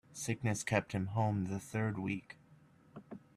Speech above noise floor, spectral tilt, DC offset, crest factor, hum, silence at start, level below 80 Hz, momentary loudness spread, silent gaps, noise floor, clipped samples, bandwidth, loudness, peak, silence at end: 28 dB; -5.5 dB/octave; under 0.1%; 22 dB; none; 0.1 s; -68 dBFS; 21 LU; none; -64 dBFS; under 0.1%; 14 kHz; -37 LUFS; -16 dBFS; 0.2 s